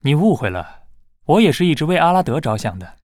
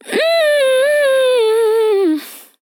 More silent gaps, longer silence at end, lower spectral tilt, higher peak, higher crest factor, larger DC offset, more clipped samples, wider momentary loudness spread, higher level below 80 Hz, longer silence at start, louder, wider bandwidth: neither; second, 0.1 s vs 0.25 s; first, -6.5 dB/octave vs -2 dB/octave; about the same, -2 dBFS vs -4 dBFS; about the same, 14 dB vs 10 dB; neither; neither; first, 14 LU vs 5 LU; first, -46 dBFS vs under -90 dBFS; about the same, 0.05 s vs 0.05 s; second, -17 LUFS vs -13 LUFS; second, 15 kHz vs 19 kHz